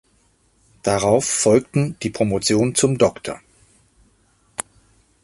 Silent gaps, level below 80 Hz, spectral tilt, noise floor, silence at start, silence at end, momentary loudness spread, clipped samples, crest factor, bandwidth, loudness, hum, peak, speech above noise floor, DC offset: none; -50 dBFS; -4.5 dB/octave; -60 dBFS; 0.85 s; 0.6 s; 16 LU; under 0.1%; 20 dB; 12 kHz; -19 LUFS; none; -2 dBFS; 42 dB; under 0.1%